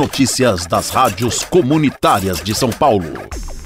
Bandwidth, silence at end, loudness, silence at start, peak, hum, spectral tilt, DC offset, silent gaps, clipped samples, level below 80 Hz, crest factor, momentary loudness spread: 16 kHz; 0 s; -15 LUFS; 0 s; -2 dBFS; none; -4.5 dB/octave; under 0.1%; none; under 0.1%; -36 dBFS; 14 dB; 5 LU